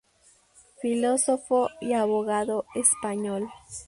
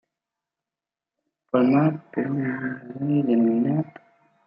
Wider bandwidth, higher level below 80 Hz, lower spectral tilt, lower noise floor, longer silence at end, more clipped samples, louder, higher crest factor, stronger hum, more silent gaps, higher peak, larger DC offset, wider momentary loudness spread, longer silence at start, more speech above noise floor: first, 11.5 kHz vs 5.2 kHz; first, -64 dBFS vs -72 dBFS; second, -3.5 dB/octave vs -11.5 dB/octave; second, -61 dBFS vs -90 dBFS; second, 0.05 s vs 0.55 s; neither; about the same, -25 LUFS vs -23 LUFS; about the same, 20 dB vs 18 dB; neither; neither; about the same, -6 dBFS vs -6 dBFS; neither; about the same, 9 LU vs 11 LU; second, 0.8 s vs 1.55 s; second, 35 dB vs 68 dB